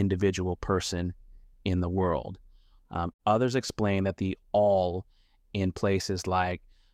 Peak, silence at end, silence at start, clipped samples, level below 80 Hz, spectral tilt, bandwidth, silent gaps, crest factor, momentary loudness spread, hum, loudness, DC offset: -12 dBFS; 0.35 s; 0 s; under 0.1%; -50 dBFS; -6 dB/octave; 14 kHz; 3.14-3.19 s; 18 dB; 12 LU; none; -29 LUFS; under 0.1%